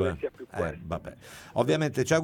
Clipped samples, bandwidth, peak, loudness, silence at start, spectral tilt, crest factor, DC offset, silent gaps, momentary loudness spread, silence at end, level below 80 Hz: under 0.1%; 18 kHz; -10 dBFS; -30 LUFS; 0 s; -5.5 dB/octave; 20 dB; under 0.1%; none; 13 LU; 0 s; -52 dBFS